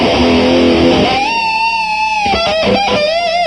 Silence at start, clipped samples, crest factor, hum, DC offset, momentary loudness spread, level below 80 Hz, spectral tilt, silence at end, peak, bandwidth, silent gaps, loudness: 0 s; under 0.1%; 12 dB; none; 0.3%; 3 LU; -32 dBFS; -5 dB/octave; 0 s; 0 dBFS; 11 kHz; none; -11 LUFS